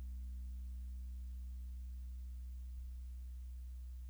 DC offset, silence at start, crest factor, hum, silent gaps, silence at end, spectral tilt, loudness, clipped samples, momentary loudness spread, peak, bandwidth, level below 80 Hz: under 0.1%; 0 s; 6 dB; none; none; 0 s; -6.5 dB/octave; -50 LUFS; under 0.1%; 2 LU; -40 dBFS; over 20 kHz; -46 dBFS